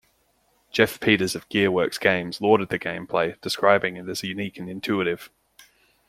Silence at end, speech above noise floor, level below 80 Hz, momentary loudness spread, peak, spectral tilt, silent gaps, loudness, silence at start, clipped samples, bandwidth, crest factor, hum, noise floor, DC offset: 0.8 s; 42 dB; -62 dBFS; 10 LU; -2 dBFS; -4.5 dB/octave; none; -23 LUFS; 0.75 s; under 0.1%; 16 kHz; 22 dB; none; -66 dBFS; under 0.1%